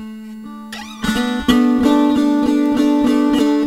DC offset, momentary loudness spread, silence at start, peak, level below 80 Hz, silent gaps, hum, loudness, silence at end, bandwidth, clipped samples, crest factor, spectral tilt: 0.2%; 18 LU; 0 s; 0 dBFS; -40 dBFS; none; none; -15 LUFS; 0 s; 15.5 kHz; under 0.1%; 16 dB; -5 dB/octave